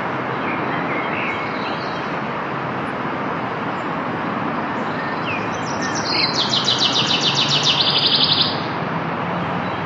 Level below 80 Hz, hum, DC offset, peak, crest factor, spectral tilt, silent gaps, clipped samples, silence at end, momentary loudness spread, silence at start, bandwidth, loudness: -58 dBFS; none; under 0.1%; -2 dBFS; 18 dB; -3.5 dB/octave; none; under 0.1%; 0 s; 10 LU; 0 s; 11 kHz; -19 LUFS